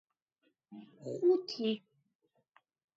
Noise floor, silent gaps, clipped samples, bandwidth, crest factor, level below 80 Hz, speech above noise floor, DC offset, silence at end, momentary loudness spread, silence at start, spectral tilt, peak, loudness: -79 dBFS; none; under 0.1%; 7.6 kHz; 18 dB; -88 dBFS; 46 dB; under 0.1%; 1.2 s; 23 LU; 0.7 s; -5 dB/octave; -20 dBFS; -34 LUFS